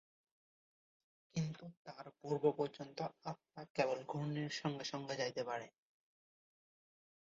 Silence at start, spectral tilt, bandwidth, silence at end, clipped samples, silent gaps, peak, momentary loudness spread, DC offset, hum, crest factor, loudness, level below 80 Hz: 1.35 s; -5 dB/octave; 7.6 kHz; 1.55 s; under 0.1%; 1.77-1.85 s, 3.70-3.75 s; -20 dBFS; 15 LU; under 0.1%; none; 24 dB; -42 LUFS; -80 dBFS